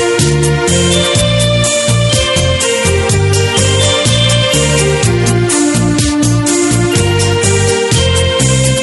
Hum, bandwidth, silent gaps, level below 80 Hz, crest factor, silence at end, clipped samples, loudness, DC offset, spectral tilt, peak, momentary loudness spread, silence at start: none; 12 kHz; none; -28 dBFS; 10 dB; 0 s; under 0.1%; -10 LUFS; under 0.1%; -4 dB/octave; 0 dBFS; 2 LU; 0 s